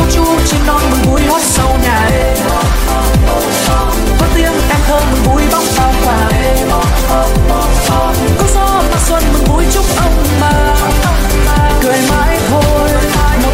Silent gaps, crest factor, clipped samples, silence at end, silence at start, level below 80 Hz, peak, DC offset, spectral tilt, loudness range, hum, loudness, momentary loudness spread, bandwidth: none; 10 dB; under 0.1%; 0 s; 0 s; -14 dBFS; 0 dBFS; under 0.1%; -4.5 dB/octave; 0 LU; none; -11 LUFS; 2 LU; 16.5 kHz